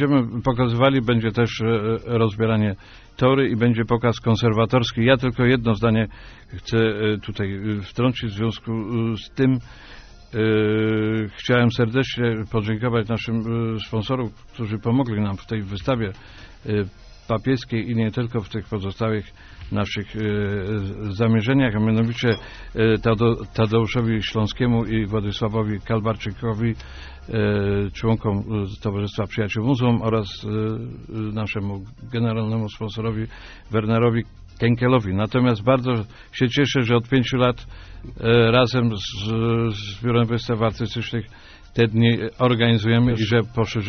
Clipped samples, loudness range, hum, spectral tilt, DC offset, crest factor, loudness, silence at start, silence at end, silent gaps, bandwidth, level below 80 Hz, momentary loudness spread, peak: under 0.1%; 5 LU; none; -6 dB/octave; under 0.1%; 18 dB; -22 LUFS; 0 s; 0 s; none; 6.6 kHz; -42 dBFS; 10 LU; -4 dBFS